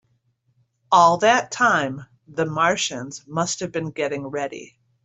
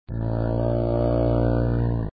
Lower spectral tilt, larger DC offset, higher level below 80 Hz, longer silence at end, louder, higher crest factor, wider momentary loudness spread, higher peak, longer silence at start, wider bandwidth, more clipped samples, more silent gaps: second, -3.5 dB/octave vs -13.5 dB/octave; second, under 0.1% vs 0.2%; second, -64 dBFS vs -30 dBFS; first, 0.4 s vs 0.05 s; about the same, -21 LUFS vs -23 LUFS; first, 20 dB vs 12 dB; first, 16 LU vs 4 LU; first, -2 dBFS vs -10 dBFS; first, 0.9 s vs 0.1 s; first, 8.2 kHz vs 4.9 kHz; neither; neither